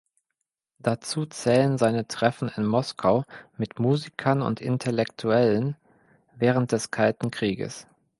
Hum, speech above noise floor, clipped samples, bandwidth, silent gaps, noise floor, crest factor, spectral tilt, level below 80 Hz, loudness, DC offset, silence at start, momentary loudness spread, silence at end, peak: none; 58 dB; under 0.1%; 11.5 kHz; none; -83 dBFS; 22 dB; -6 dB/octave; -62 dBFS; -25 LUFS; under 0.1%; 0.85 s; 10 LU; 0.35 s; -4 dBFS